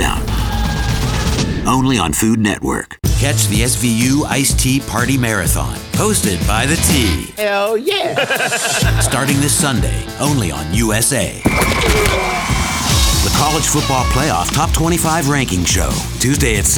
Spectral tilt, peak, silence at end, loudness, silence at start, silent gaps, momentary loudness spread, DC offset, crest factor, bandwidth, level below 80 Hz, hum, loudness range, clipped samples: -4 dB/octave; 0 dBFS; 0 s; -15 LUFS; 0 s; none; 5 LU; under 0.1%; 14 dB; over 20 kHz; -24 dBFS; none; 1 LU; under 0.1%